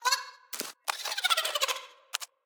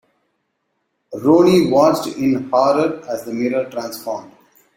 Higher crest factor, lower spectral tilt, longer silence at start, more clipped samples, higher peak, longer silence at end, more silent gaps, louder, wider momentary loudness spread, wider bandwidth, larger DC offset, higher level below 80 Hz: first, 24 dB vs 16 dB; second, 3 dB/octave vs -6 dB/octave; second, 0 s vs 1.1 s; neither; second, -8 dBFS vs -2 dBFS; second, 0.2 s vs 0.5 s; neither; second, -30 LUFS vs -17 LUFS; second, 11 LU vs 15 LU; first, over 20 kHz vs 16.5 kHz; neither; second, -84 dBFS vs -58 dBFS